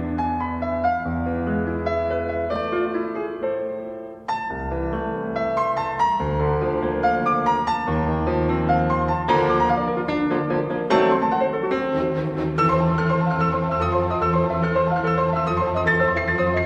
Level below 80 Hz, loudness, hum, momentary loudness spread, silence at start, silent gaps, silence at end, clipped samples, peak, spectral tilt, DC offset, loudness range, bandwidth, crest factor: -38 dBFS; -22 LUFS; none; 7 LU; 0 s; none; 0 s; under 0.1%; -4 dBFS; -8 dB/octave; under 0.1%; 5 LU; 8 kHz; 16 dB